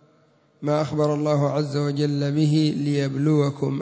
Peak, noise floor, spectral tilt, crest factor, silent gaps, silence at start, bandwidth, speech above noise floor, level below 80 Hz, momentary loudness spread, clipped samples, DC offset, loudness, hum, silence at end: -8 dBFS; -59 dBFS; -7.5 dB/octave; 14 dB; none; 0.6 s; 8 kHz; 38 dB; -64 dBFS; 4 LU; under 0.1%; under 0.1%; -22 LUFS; none; 0 s